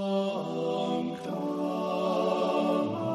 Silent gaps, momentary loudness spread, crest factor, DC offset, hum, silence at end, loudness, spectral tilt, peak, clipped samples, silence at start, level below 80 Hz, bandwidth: none; 5 LU; 14 dB; under 0.1%; none; 0 s; -30 LUFS; -7 dB/octave; -16 dBFS; under 0.1%; 0 s; -74 dBFS; 13.5 kHz